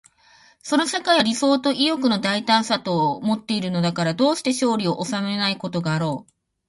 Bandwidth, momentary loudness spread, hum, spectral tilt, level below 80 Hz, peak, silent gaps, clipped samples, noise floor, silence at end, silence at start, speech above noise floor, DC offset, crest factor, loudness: 11.5 kHz; 6 LU; none; -4.5 dB/octave; -64 dBFS; -4 dBFS; none; under 0.1%; -54 dBFS; 0.45 s; 0.65 s; 33 dB; under 0.1%; 18 dB; -21 LUFS